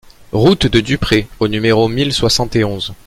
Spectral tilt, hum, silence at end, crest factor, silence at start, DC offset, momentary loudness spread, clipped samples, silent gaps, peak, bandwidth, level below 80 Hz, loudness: -5 dB/octave; none; 0.1 s; 14 dB; 0.05 s; under 0.1%; 5 LU; under 0.1%; none; 0 dBFS; 16 kHz; -32 dBFS; -14 LUFS